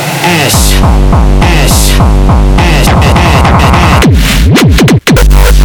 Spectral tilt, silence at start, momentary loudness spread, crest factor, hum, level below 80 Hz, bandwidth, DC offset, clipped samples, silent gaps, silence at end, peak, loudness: -5 dB/octave; 0 s; 2 LU; 4 dB; none; -8 dBFS; over 20 kHz; 1%; 0.5%; none; 0 s; 0 dBFS; -6 LUFS